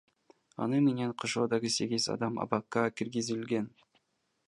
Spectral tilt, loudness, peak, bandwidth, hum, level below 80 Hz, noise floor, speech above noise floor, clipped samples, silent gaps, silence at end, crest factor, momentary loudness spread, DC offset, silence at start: -4.5 dB/octave; -32 LUFS; -10 dBFS; 11.5 kHz; none; -74 dBFS; -75 dBFS; 44 dB; under 0.1%; none; 0.8 s; 22 dB; 7 LU; under 0.1%; 0.6 s